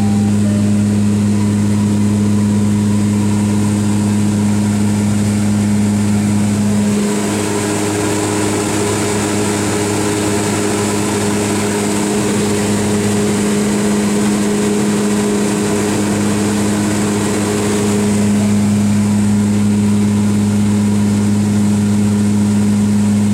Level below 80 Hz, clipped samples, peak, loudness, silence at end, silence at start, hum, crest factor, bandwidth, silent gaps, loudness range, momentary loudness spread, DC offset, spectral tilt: -40 dBFS; under 0.1%; -4 dBFS; -14 LUFS; 0 s; 0 s; none; 10 dB; 15.5 kHz; none; 2 LU; 2 LU; under 0.1%; -5.5 dB/octave